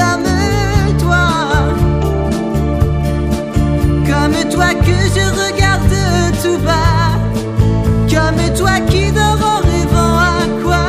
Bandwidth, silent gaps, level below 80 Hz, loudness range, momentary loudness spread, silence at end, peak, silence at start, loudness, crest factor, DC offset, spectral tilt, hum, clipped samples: 15.5 kHz; none; -20 dBFS; 2 LU; 4 LU; 0 s; 0 dBFS; 0 s; -13 LUFS; 12 dB; under 0.1%; -5.5 dB/octave; none; under 0.1%